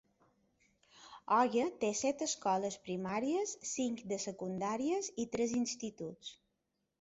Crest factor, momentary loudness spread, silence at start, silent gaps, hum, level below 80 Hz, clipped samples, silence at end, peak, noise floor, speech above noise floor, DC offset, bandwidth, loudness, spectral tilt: 20 dB; 12 LU; 0.95 s; none; none; -74 dBFS; under 0.1%; 0.65 s; -18 dBFS; -84 dBFS; 48 dB; under 0.1%; 8 kHz; -36 LUFS; -4 dB/octave